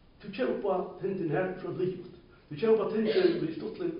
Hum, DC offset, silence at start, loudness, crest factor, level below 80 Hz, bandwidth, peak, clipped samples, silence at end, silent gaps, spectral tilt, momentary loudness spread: none; under 0.1%; 0.2 s; -30 LUFS; 18 dB; -64 dBFS; 5.2 kHz; -12 dBFS; under 0.1%; 0 s; none; -5.5 dB/octave; 14 LU